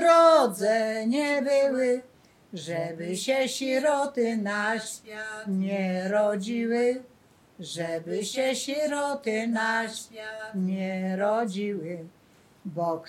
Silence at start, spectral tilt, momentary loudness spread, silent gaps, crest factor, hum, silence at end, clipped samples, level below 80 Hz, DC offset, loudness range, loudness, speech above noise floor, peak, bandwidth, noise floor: 0 s; -4.5 dB/octave; 13 LU; none; 20 dB; none; 0 s; under 0.1%; -76 dBFS; under 0.1%; 2 LU; -27 LUFS; 25 dB; -6 dBFS; 15.5 kHz; -52 dBFS